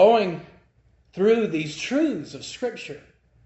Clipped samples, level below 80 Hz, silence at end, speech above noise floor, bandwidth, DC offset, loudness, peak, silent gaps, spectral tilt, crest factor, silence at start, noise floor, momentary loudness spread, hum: under 0.1%; -62 dBFS; 0.5 s; 35 dB; 8.2 kHz; under 0.1%; -24 LUFS; -4 dBFS; none; -5.5 dB/octave; 18 dB; 0 s; -60 dBFS; 18 LU; none